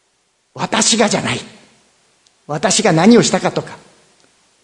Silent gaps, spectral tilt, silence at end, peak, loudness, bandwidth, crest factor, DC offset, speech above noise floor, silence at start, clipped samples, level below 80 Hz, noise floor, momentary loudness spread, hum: none; -3.5 dB/octave; 0.85 s; 0 dBFS; -14 LUFS; 11 kHz; 16 dB; under 0.1%; 48 dB; 0.55 s; under 0.1%; -56 dBFS; -62 dBFS; 16 LU; none